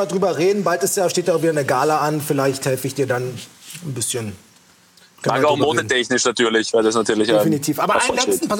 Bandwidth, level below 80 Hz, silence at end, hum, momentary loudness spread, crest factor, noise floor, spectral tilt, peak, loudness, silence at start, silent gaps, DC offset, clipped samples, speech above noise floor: 18.5 kHz; -60 dBFS; 0 s; none; 8 LU; 16 dB; -52 dBFS; -4 dB/octave; -4 dBFS; -18 LUFS; 0 s; none; under 0.1%; under 0.1%; 33 dB